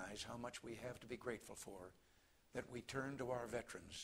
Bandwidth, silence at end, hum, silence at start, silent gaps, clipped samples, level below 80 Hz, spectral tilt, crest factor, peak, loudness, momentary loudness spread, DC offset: 16 kHz; 0 s; none; 0 s; none; under 0.1%; -72 dBFS; -4 dB/octave; 20 dB; -30 dBFS; -50 LUFS; 8 LU; under 0.1%